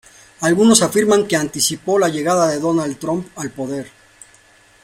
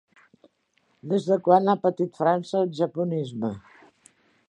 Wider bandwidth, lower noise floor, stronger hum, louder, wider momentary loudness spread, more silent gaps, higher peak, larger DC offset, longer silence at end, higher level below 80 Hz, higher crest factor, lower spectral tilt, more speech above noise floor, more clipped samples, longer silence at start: first, 16.5 kHz vs 10.5 kHz; second, -50 dBFS vs -69 dBFS; neither; first, -17 LUFS vs -24 LUFS; about the same, 14 LU vs 12 LU; neither; first, 0 dBFS vs -4 dBFS; neither; about the same, 0.95 s vs 0.9 s; first, -56 dBFS vs -70 dBFS; about the same, 18 dB vs 22 dB; second, -4 dB/octave vs -7.5 dB/octave; second, 34 dB vs 45 dB; neither; second, 0.4 s vs 1.05 s